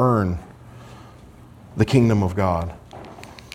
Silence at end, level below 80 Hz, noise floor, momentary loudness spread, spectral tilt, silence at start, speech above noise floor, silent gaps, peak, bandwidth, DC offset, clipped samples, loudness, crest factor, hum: 0.15 s; -46 dBFS; -45 dBFS; 26 LU; -7.5 dB/octave; 0 s; 26 dB; none; -4 dBFS; 14 kHz; under 0.1%; under 0.1%; -21 LUFS; 20 dB; none